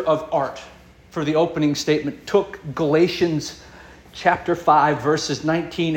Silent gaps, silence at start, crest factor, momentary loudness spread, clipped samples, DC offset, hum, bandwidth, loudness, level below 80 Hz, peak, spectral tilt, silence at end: none; 0 s; 18 dB; 13 LU; under 0.1%; under 0.1%; none; 17 kHz; -21 LUFS; -52 dBFS; -2 dBFS; -5.5 dB/octave; 0 s